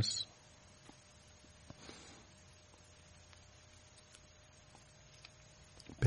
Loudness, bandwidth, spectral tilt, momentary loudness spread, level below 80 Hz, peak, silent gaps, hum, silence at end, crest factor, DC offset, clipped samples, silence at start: -52 LUFS; 11 kHz; -3.5 dB/octave; 9 LU; -70 dBFS; -18 dBFS; none; none; 0 s; 28 dB; under 0.1%; under 0.1%; 0 s